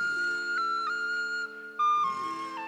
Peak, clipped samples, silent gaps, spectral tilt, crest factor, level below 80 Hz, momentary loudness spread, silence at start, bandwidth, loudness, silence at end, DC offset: -20 dBFS; under 0.1%; none; -1.5 dB/octave; 12 dB; -80 dBFS; 8 LU; 0 s; 13.5 kHz; -29 LUFS; 0 s; under 0.1%